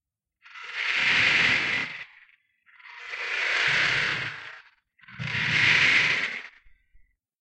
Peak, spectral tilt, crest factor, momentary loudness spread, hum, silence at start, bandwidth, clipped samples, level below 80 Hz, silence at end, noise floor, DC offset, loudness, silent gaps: -8 dBFS; -2 dB/octave; 20 dB; 21 LU; none; 0.55 s; 9.2 kHz; under 0.1%; -62 dBFS; 0.9 s; -61 dBFS; under 0.1%; -22 LUFS; none